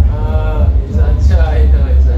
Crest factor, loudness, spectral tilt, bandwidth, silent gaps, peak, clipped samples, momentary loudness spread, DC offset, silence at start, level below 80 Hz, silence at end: 8 dB; -12 LUFS; -9 dB/octave; 5 kHz; none; -2 dBFS; under 0.1%; 3 LU; under 0.1%; 0 s; -10 dBFS; 0 s